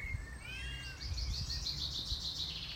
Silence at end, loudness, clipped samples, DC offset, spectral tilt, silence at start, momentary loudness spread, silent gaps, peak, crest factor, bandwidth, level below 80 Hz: 0 s; -39 LUFS; under 0.1%; under 0.1%; -2.5 dB/octave; 0 s; 7 LU; none; -26 dBFS; 14 dB; 16 kHz; -46 dBFS